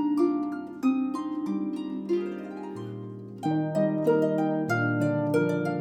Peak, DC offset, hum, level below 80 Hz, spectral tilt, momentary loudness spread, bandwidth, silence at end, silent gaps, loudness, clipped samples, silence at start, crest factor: -12 dBFS; under 0.1%; none; -78 dBFS; -8 dB/octave; 13 LU; 13.5 kHz; 0 s; none; -28 LUFS; under 0.1%; 0 s; 14 dB